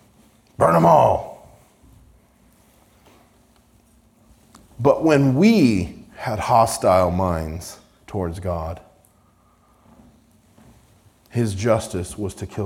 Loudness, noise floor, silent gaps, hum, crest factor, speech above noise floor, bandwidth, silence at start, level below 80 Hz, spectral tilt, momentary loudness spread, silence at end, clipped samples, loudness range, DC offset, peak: -19 LUFS; -57 dBFS; none; none; 18 dB; 39 dB; 17 kHz; 0.6 s; -48 dBFS; -6.5 dB/octave; 17 LU; 0 s; under 0.1%; 15 LU; under 0.1%; -2 dBFS